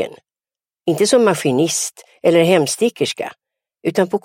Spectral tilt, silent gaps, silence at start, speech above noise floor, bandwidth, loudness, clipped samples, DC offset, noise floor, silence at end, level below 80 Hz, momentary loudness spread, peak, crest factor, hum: -4 dB/octave; none; 0 s; over 74 dB; 16.5 kHz; -17 LUFS; under 0.1%; under 0.1%; under -90 dBFS; 0.05 s; -68 dBFS; 12 LU; -2 dBFS; 16 dB; none